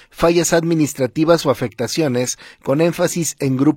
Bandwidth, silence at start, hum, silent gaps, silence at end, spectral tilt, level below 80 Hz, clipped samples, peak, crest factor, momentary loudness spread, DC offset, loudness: 16.5 kHz; 0.15 s; none; none; 0 s; -5 dB/octave; -46 dBFS; under 0.1%; -2 dBFS; 16 dB; 6 LU; under 0.1%; -17 LUFS